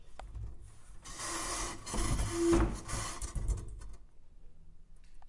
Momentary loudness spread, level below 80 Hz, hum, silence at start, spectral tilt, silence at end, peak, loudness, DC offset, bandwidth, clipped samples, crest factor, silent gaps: 22 LU; -40 dBFS; none; 0 s; -4.5 dB/octave; 0 s; -16 dBFS; -36 LUFS; under 0.1%; 11.5 kHz; under 0.1%; 20 dB; none